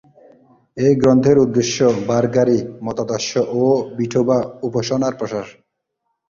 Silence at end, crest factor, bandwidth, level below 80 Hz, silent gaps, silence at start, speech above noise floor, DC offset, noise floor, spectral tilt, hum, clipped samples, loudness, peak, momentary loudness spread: 0.8 s; 16 dB; 7.4 kHz; -52 dBFS; none; 0.75 s; 57 dB; under 0.1%; -74 dBFS; -6 dB/octave; none; under 0.1%; -17 LUFS; -2 dBFS; 12 LU